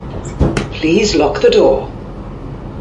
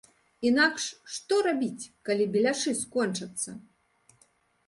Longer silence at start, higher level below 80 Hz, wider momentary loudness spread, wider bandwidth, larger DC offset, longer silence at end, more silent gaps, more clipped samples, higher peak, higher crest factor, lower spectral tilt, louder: second, 0 s vs 0.4 s; first, -26 dBFS vs -72 dBFS; first, 18 LU vs 12 LU; about the same, 11.5 kHz vs 11.5 kHz; neither; second, 0 s vs 1.05 s; neither; neither; first, 0 dBFS vs -10 dBFS; second, 14 dB vs 20 dB; first, -5.5 dB/octave vs -3 dB/octave; first, -13 LUFS vs -28 LUFS